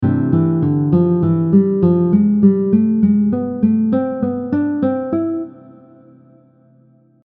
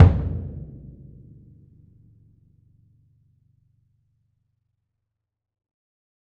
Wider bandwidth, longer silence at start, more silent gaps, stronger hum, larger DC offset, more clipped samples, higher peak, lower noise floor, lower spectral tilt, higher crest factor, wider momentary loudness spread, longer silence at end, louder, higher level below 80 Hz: about the same, 3.5 kHz vs 3.8 kHz; about the same, 0 s vs 0 s; neither; neither; neither; neither; about the same, -2 dBFS vs 0 dBFS; second, -51 dBFS vs -82 dBFS; first, -14 dB/octave vs -10 dB/octave; second, 14 dB vs 26 dB; second, 7 LU vs 26 LU; second, 1.75 s vs 5.6 s; first, -15 LUFS vs -23 LUFS; second, -52 dBFS vs -36 dBFS